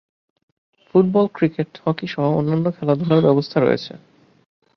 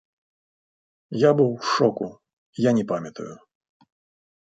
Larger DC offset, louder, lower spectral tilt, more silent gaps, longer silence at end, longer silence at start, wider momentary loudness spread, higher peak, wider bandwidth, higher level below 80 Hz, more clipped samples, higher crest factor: neither; first, -19 LUFS vs -22 LUFS; first, -9 dB/octave vs -6.5 dB/octave; second, none vs 2.33-2.53 s; second, 0.8 s vs 1.15 s; second, 0.95 s vs 1.1 s; second, 8 LU vs 19 LU; about the same, -2 dBFS vs -4 dBFS; second, 6.4 kHz vs 9 kHz; first, -60 dBFS vs -68 dBFS; neither; about the same, 18 dB vs 22 dB